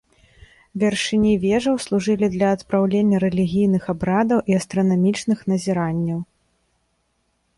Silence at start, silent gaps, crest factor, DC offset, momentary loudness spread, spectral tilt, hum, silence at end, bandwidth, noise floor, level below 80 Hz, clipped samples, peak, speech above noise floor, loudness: 0.75 s; none; 14 dB; under 0.1%; 5 LU; -6.5 dB/octave; none; 1.35 s; 11.5 kHz; -68 dBFS; -50 dBFS; under 0.1%; -6 dBFS; 49 dB; -20 LUFS